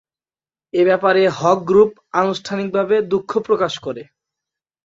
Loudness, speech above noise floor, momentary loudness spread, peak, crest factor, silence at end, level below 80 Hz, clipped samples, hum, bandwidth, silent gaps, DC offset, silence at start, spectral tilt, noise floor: -17 LUFS; over 73 dB; 10 LU; -2 dBFS; 16 dB; 0.85 s; -60 dBFS; under 0.1%; none; 7.8 kHz; none; under 0.1%; 0.75 s; -5.5 dB/octave; under -90 dBFS